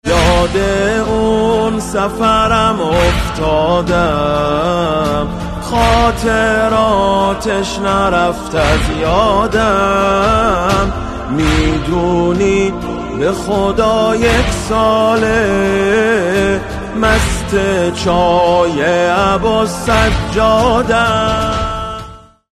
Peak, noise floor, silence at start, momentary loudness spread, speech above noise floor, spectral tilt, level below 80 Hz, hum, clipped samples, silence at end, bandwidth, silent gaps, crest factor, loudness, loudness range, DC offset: 0 dBFS; -34 dBFS; 0.05 s; 5 LU; 21 dB; -5 dB/octave; -24 dBFS; none; under 0.1%; 0.4 s; 13.5 kHz; none; 12 dB; -13 LUFS; 1 LU; under 0.1%